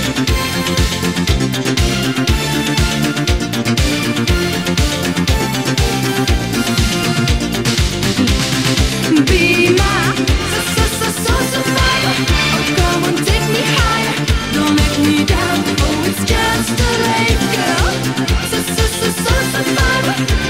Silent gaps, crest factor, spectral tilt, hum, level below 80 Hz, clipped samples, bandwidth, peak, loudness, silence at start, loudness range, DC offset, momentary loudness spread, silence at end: none; 14 dB; -4 dB/octave; none; -22 dBFS; under 0.1%; 16 kHz; 0 dBFS; -14 LUFS; 0 s; 2 LU; 0.4%; 3 LU; 0 s